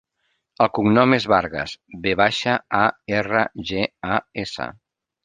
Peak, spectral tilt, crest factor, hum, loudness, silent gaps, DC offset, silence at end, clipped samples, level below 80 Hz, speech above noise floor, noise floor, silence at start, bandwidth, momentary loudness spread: 0 dBFS; -5.5 dB/octave; 20 dB; none; -21 LUFS; none; under 0.1%; 0.55 s; under 0.1%; -52 dBFS; 51 dB; -72 dBFS; 0.6 s; 9.6 kHz; 13 LU